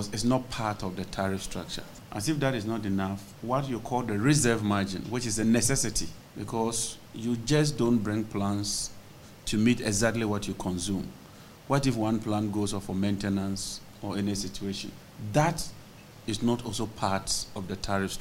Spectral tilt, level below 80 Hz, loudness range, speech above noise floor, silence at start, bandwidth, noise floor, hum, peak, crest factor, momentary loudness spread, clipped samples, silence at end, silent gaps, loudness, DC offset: -4.5 dB/octave; -48 dBFS; 4 LU; 20 dB; 0 s; 16 kHz; -49 dBFS; none; -10 dBFS; 20 dB; 13 LU; under 0.1%; 0 s; none; -29 LUFS; under 0.1%